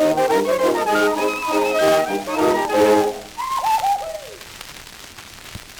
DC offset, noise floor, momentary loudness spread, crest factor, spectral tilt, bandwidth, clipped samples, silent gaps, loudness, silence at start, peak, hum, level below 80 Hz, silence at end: under 0.1%; -39 dBFS; 19 LU; 16 dB; -3.5 dB/octave; over 20 kHz; under 0.1%; none; -18 LUFS; 0 s; -4 dBFS; none; -52 dBFS; 0 s